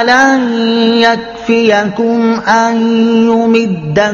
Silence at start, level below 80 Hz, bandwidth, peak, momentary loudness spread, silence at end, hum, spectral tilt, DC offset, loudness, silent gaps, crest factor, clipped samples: 0 s; -48 dBFS; 7.2 kHz; 0 dBFS; 4 LU; 0 s; none; -5 dB/octave; under 0.1%; -10 LUFS; none; 10 dB; 0.2%